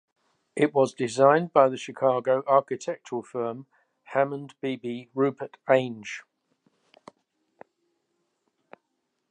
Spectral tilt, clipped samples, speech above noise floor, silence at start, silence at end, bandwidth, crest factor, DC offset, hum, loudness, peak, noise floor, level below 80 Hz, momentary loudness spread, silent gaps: -6 dB/octave; under 0.1%; 54 dB; 0.55 s; 3.1 s; 10.5 kHz; 22 dB; under 0.1%; none; -25 LUFS; -4 dBFS; -78 dBFS; -80 dBFS; 15 LU; none